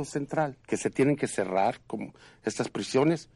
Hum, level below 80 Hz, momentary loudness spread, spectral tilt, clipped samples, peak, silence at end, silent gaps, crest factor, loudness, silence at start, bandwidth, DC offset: none; -64 dBFS; 12 LU; -5.5 dB/octave; under 0.1%; -14 dBFS; 0.1 s; none; 16 dB; -29 LUFS; 0 s; 11.5 kHz; under 0.1%